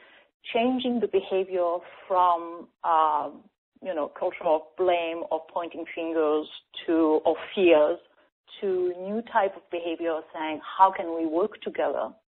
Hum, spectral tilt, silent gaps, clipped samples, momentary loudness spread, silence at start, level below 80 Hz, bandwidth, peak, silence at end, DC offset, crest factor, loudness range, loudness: none; -2.5 dB/octave; 3.58-3.72 s, 8.32-8.44 s; under 0.1%; 12 LU; 0.45 s; -70 dBFS; 4.2 kHz; -6 dBFS; 0.15 s; under 0.1%; 22 dB; 3 LU; -26 LUFS